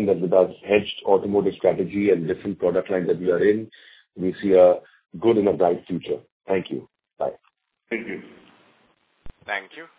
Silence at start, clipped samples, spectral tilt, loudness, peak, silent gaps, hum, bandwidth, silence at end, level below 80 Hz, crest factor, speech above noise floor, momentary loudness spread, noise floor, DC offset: 0 s; under 0.1%; -10.5 dB/octave; -22 LUFS; -4 dBFS; 6.32-6.40 s; none; 4 kHz; 0.15 s; -56 dBFS; 20 dB; 42 dB; 12 LU; -63 dBFS; under 0.1%